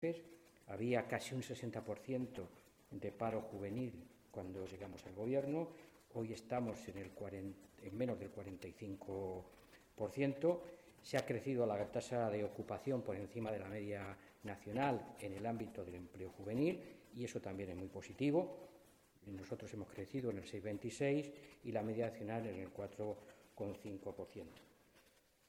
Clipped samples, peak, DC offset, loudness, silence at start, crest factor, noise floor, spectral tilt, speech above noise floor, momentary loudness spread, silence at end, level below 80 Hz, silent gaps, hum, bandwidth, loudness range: under 0.1%; -24 dBFS; under 0.1%; -44 LUFS; 0 s; 20 dB; -72 dBFS; -6.5 dB/octave; 29 dB; 14 LU; 0.5 s; -74 dBFS; none; none; 16 kHz; 5 LU